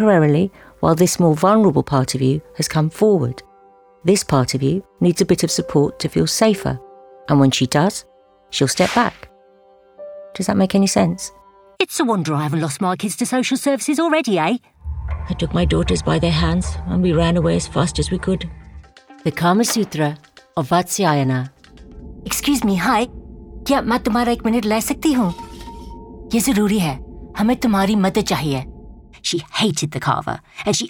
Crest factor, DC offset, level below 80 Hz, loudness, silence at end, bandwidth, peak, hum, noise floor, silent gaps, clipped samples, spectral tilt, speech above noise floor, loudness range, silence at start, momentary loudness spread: 16 dB; under 0.1%; -36 dBFS; -18 LUFS; 0 s; over 20 kHz; -2 dBFS; none; -50 dBFS; none; under 0.1%; -5 dB/octave; 33 dB; 3 LU; 0 s; 14 LU